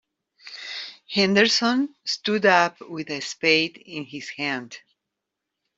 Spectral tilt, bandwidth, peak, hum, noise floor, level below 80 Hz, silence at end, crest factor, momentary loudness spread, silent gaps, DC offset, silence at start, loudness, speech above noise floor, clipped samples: -3.5 dB/octave; 8 kHz; -4 dBFS; none; -83 dBFS; -70 dBFS; 1 s; 20 dB; 17 LU; none; under 0.1%; 0.45 s; -22 LUFS; 60 dB; under 0.1%